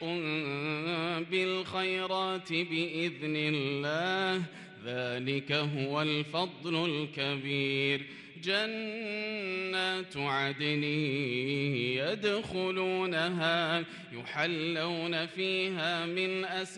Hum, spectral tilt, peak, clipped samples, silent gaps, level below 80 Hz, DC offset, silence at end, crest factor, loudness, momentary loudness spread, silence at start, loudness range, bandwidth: none; -5.5 dB/octave; -16 dBFS; under 0.1%; none; -72 dBFS; under 0.1%; 0 s; 16 dB; -32 LUFS; 4 LU; 0 s; 1 LU; 11.5 kHz